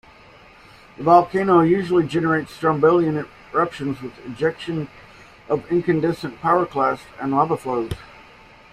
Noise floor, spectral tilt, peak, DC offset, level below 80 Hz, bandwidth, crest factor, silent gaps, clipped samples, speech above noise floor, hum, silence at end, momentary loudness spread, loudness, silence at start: -47 dBFS; -7.5 dB/octave; -2 dBFS; under 0.1%; -52 dBFS; 12 kHz; 18 dB; none; under 0.1%; 28 dB; none; 0.7 s; 13 LU; -20 LUFS; 1 s